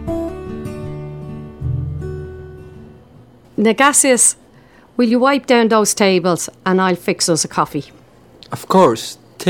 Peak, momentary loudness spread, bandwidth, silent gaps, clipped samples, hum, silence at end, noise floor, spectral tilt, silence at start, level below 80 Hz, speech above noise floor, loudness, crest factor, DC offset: 0 dBFS; 19 LU; 18 kHz; none; under 0.1%; none; 0 s; -46 dBFS; -3.5 dB/octave; 0 s; -44 dBFS; 32 dB; -15 LUFS; 18 dB; 0.1%